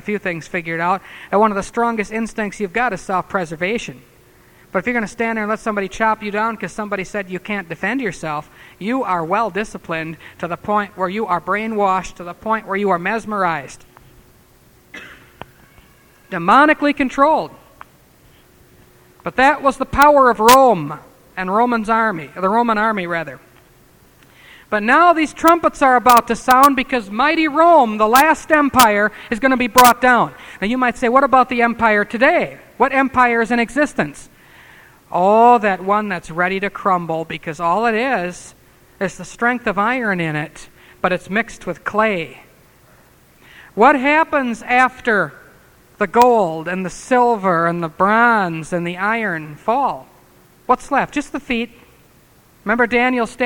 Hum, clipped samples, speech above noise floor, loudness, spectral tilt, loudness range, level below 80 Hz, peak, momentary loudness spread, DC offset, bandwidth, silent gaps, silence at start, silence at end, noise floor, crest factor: none; under 0.1%; 34 dB; -16 LUFS; -4.5 dB/octave; 9 LU; -46 dBFS; 0 dBFS; 14 LU; under 0.1%; over 20 kHz; none; 0.05 s; 0 s; -50 dBFS; 18 dB